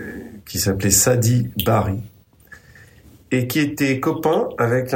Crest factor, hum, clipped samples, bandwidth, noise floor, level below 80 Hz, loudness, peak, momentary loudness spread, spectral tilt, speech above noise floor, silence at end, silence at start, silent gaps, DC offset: 18 dB; none; under 0.1%; 16.5 kHz; -47 dBFS; -48 dBFS; -19 LUFS; -2 dBFS; 12 LU; -4.5 dB/octave; 29 dB; 0 s; 0 s; none; under 0.1%